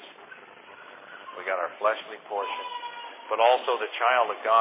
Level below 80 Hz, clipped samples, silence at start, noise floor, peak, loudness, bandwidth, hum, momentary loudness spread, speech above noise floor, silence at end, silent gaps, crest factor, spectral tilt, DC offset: under -90 dBFS; under 0.1%; 0 s; -48 dBFS; -8 dBFS; -27 LUFS; 4 kHz; none; 24 LU; 22 dB; 0 s; none; 20 dB; -4.5 dB/octave; under 0.1%